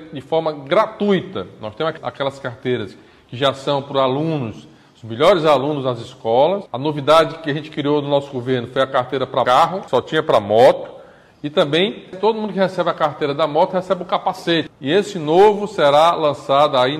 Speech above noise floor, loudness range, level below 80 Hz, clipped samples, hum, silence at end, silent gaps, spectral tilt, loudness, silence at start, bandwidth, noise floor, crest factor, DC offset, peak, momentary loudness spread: 25 dB; 5 LU; -58 dBFS; under 0.1%; none; 0 s; none; -6 dB/octave; -18 LUFS; 0 s; 14.5 kHz; -43 dBFS; 16 dB; under 0.1%; -2 dBFS; 11 LU